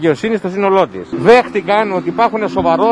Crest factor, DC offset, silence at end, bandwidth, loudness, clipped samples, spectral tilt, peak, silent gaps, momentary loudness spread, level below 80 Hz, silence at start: 12 dB; under 0.1%; 0 s; 10.5 kHz; -13 LUFS; 0.5%; -6.5 dB/octave; 0 dBFS; none; 7 LU; -46 dBFS; 0 s